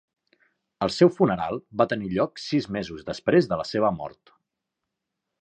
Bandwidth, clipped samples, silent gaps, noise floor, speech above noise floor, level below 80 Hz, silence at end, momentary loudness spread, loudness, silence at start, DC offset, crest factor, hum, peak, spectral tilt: 9 kHz; under 0.1%; none; -84 dBFS; 60 dB; -56 dBFS; 1.3 s; 11 LU; -24 LUFS; 0.8 s; under 0.1%; 22 dB; none; -4 dBFS; -6.5 dB/octave